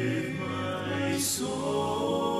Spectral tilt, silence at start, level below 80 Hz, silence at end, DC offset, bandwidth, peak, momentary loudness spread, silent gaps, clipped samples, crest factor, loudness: -4 dB/octave; 0 s; -62 dBFS; 0 s; under 0.1%; 14 kHz; -16 dBFS; 4 LU; none; under 0.1%; 12 dB; -30 LUFS